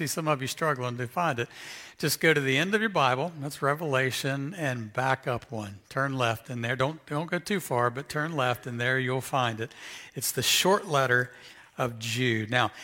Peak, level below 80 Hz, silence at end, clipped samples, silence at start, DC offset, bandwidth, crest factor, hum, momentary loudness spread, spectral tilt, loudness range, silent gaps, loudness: -8 dBFS; -66 dBFS; 0 s; under 0.1%; 0 s; under 0.1%; 17 kHz; 22 dB; none; 10 LU; -4 dB/octave; 3 LU; none; -28 LUFS